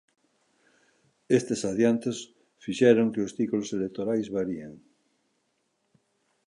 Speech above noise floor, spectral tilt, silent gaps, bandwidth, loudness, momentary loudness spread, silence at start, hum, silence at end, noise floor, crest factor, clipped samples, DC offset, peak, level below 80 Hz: 49 dB; -5.5 dB/octave; none; 11 kHz; -27 LUFS; 17 LU; 1.3 s; none; 1.7 s; -75 dBFS; 22 dB; under 0.1%; under 0.1%; -6 dBFS; -68 dBFS